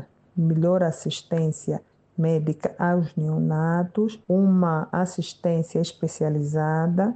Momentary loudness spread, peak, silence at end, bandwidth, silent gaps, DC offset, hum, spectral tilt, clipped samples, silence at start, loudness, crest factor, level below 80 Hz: 7 LU; -8 dBFS; 0 s; 8.8 kHz; none; under 0.1%; none; -7.5 dB/octave; under 0.1%; 0 s; -24 LUFS; 14 dB; -64 dBFS